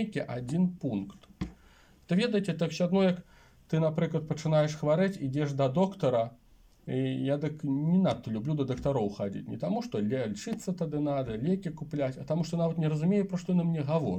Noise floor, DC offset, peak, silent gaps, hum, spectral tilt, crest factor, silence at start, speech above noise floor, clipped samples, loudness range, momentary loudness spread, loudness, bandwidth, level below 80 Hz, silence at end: -59 dBFS; under 0.1%; -14 dBFS; none; none; -7.5 dB/octave; 16 dB; 0 s; 29 dB; under 0.1%; 3 LU; 9 LU; -30 LUFS; 9.4 kHz; -58 dBFS; 0 s